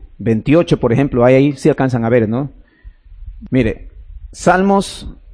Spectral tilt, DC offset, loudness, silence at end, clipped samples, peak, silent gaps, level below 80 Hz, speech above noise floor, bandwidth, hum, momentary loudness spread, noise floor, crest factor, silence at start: -7 dB/octave; under 0.1%; -14 LUFS; 0 s; under 0.1%; 0 dBFS; none; -34 dBFS; 27 dB; 10.5 kHz; none; 11 LU; -40 dBFS; 14 dB; 0 s